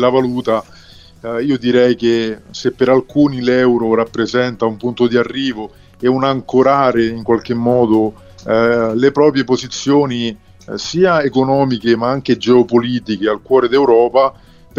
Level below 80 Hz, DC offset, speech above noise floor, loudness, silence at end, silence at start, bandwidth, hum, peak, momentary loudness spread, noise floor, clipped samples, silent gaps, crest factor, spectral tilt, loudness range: -48 dBFS; under 0.1%; 27 dB; -14 LUFS; 0.45 s; 0 s; 7.4 kHz; none; 0 dBFS; 9 LU; -41 dBFS; under 0.1%; none; 14 dB; -6 dB/octave; 2 LU